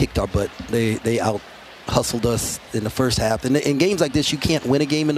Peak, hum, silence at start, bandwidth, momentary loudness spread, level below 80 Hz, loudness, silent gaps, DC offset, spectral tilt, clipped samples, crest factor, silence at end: 0 dBFS; none; 0 s; 15 kHz; 7 LU; -38 dBFS; -21 LUFS; none; under 0.1%; -5 dB/octave; under 0.1%; 20 dB; 0 s